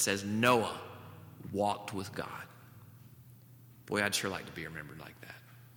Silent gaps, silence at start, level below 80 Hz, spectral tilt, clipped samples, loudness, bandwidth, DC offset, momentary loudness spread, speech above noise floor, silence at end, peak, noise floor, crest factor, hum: none; 0 s; -70 dBFS; -3.5 dB/octave; under 0.1%; -34 LUFS; over 20 kHz; under 0.1%; 27 LU; 22 dB; 0 s; -12 dBFS; -57 dBFS; 26 dB; none